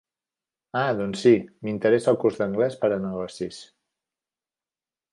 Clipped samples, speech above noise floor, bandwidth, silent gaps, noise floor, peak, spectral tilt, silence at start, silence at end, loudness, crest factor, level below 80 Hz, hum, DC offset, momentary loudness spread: under 0.1%; over 67 dB; 11 kHz; none; under -90 dBFS; -6 dBFS; -6.5 dB/octave; 0.75 s; 1.5 s; -24 LUFS; 20 dB; -64 dBFS; none; under 0.1%; 13 LU